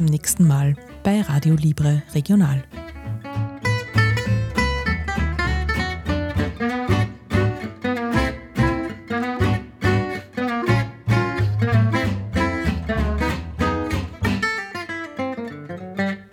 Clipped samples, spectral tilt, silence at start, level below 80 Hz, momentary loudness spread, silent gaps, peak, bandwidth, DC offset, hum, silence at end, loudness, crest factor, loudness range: under 0.1%; -6 dB/octave; 0 s; -32 dBFS; 9 LU; none; -6 dBFS; 15.5 kHz; under 0.1%; none; 0.05 s; -22 LUFS; 14 dB; 3 LU